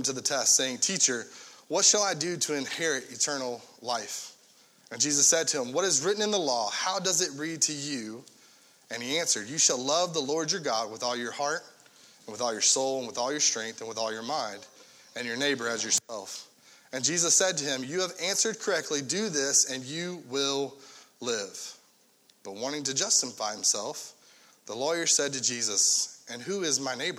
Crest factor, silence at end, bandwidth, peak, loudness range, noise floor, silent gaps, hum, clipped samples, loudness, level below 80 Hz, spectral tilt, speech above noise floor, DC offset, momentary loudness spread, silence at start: 22 dB; 0 s; 17 kHz; -8 dBFS; 4 LU; -63 dBFS; none; none; under 0.1%; -27 LUFS; -80 dBFS; -1 dB/octave; 34 dB; under 0.1%; 16 LU; 0 s